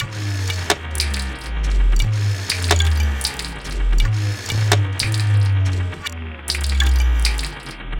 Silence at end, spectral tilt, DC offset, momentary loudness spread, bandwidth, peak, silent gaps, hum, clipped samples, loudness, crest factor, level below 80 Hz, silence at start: 0 s; -4 dB/octave; under 0.1%; 9 LU; 17 kHz; -2 dBFS; none; none; under 0.1%; -20 LUFS; 18 dB; -22 dBFS; 0 s